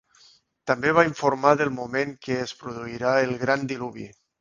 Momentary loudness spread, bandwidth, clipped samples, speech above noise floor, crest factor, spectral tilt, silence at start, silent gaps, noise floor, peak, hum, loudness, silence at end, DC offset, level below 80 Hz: 15 LU; 7.4 kHz; under 0.1%; 34 dB; 24 dB; -5.5 dB/octave; 0.65 s; none; -58 dBFS; -2 dBFS; none; -24 LUFS; 0.35 s; under 0.1%; -60 dBFS